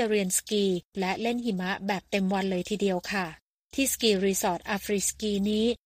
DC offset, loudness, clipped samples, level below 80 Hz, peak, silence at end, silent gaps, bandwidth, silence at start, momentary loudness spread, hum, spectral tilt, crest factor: under 0.1%; -28 LUFS; under 0.1%; -56 dBFS; -10 dBFS; 0.1 s; 0.85-0.91 s, 3.42-3.69 s; 15.5 kHz; 0 s; 6 LU; none; -4 dB/octave; 18 dB